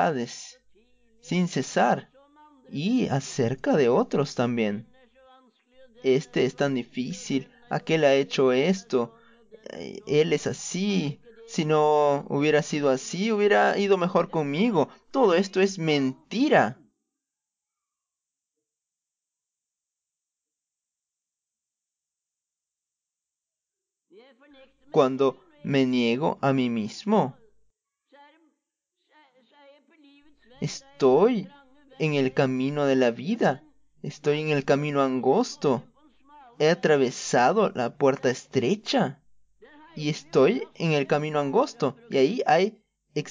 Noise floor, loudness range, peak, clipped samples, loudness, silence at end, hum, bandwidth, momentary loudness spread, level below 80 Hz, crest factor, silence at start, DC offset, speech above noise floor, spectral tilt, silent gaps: -87 dBFS; 6 LU; -8 dBFS; under 0.1%; -24 LUFS; 0 s; none; 7.6 kHz; 11 LU; -70 dBFS; 18 dB; 0 s; under 0.1%; 63 dB; -5.5 dB/octave; none